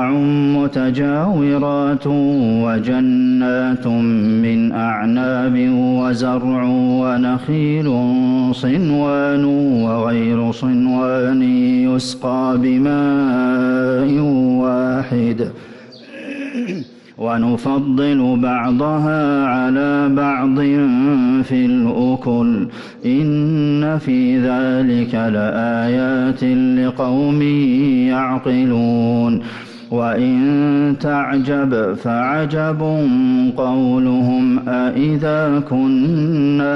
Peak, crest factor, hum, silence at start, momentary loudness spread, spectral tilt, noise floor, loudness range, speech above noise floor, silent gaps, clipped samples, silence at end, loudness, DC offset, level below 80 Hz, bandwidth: -8 dBFS; 8 dB; none; 0 s; 4 LU; -8 dB/octave; -36 dBFS; 2 LU; 21 dB; none; under 0.1%; 0 s; -16 LUFS; under 0.1%; -50 dBFS; 8.2 kHz